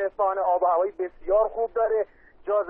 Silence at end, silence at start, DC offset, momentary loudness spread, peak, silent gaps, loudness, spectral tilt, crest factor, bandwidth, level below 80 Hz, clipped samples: 0 s; 0 s; under 0.1%; 10 LU; -12 dBFS; none; -25 LUFS; -9 dB/octave; 14 dB; 3.3 kHz; -54 dBFS; under 0.1%